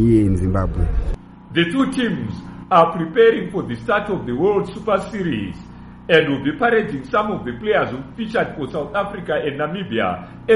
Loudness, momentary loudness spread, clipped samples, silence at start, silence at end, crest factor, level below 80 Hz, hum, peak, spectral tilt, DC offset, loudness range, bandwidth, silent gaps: -20 LUFS; 11 LU; under 0.1%; 0 s; 0 s; 18 dB; -32 dBFS; none; 0 dBFS; -7 dB/octave; under 0.1%; 3 LU; 11.5 kHz; none